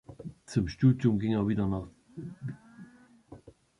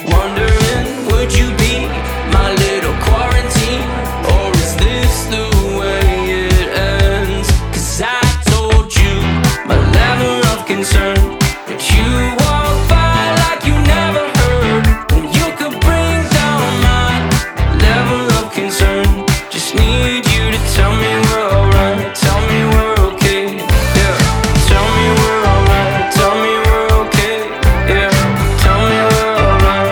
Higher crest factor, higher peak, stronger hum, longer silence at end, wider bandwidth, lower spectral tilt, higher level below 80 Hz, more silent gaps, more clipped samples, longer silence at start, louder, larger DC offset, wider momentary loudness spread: first, 20 dB vs 12 dB; second, -12 dBFS vs 0 dBFS; neither; first, 0.3 s vs 0 s; second, 11 kHz vs over 20 kHz; first, -8.5 dB/octave vs -5 dB/octave; second, -52 dBFS vs -16 dBFS; neither; neither; about the same, 0.1 s vs 0 s; second, -29 LUFS vs -13 LUFS; neither; first, 21 LU vs 4 LU